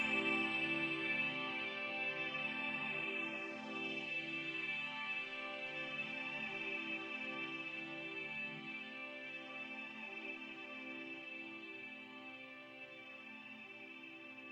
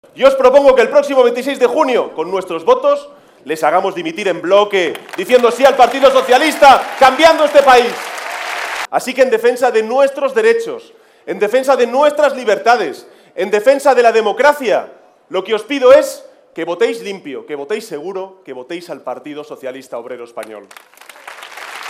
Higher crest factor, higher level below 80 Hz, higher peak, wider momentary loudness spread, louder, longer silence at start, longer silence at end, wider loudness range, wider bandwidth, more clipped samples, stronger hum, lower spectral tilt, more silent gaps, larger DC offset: about the same, 18 dB vs 14 dB; second, -86 dBFS vs -52 dBFS; second, -24 dBFS vs 0 dBFS; second, 14 LU vs 19 LU; second, -42 LUFS vs -12 LUFS; second, 0 s vs 0.15 s; about the same, 0 s vs 0 s; second, 10 LU vs 15 LU; second, 10.5 kHz vs 16 kHz; second, under 0.1% vs 0.2%; neither; about the same, -4 dB/octave vs -3 dB/octave; neither; neither